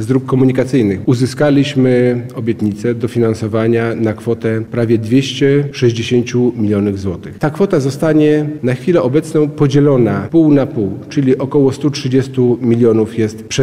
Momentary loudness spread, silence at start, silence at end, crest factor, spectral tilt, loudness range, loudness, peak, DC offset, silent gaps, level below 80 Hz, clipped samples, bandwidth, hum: 6 LU; 0 s; 0 s; 12 dB; -7 dB/octave; 2 LU; -14 LUFS; -2 dBFS; 0.3%; none; -46 dBFS; under 0.1%; 13 kHz; none